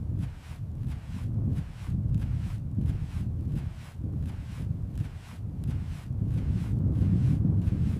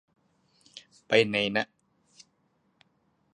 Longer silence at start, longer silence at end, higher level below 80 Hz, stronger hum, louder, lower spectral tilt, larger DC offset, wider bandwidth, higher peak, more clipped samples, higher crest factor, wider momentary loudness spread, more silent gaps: second, 0 s vs 0.75 s; second, 0 s vs 1.7 s; first, -38 dBFS vs -72 dBFS; neither; second, -31 LUFS vs -26 LUFS; first, -9 dB/octave vs -4.5 dB/octave; neither; about the same, 11 kHz vs 10.5 kHz; second, -14 dBFS vs -6 dBFS; neither; second, 14 dB vs 26 dB; second, 11 LU vs 26 LU; neither